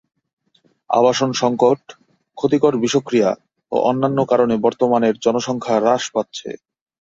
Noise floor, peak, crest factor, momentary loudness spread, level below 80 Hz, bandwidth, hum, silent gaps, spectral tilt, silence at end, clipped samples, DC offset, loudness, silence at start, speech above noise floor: -61 dBFS; -2 dBFS; 16 dB; 8 LU; -60 dBFS; 7.8 kHz; none; none; -5 dB/octave; 0.45 s; under 0.1%; under 0.1%; -18 LUFS; 0.9 s; 44 dB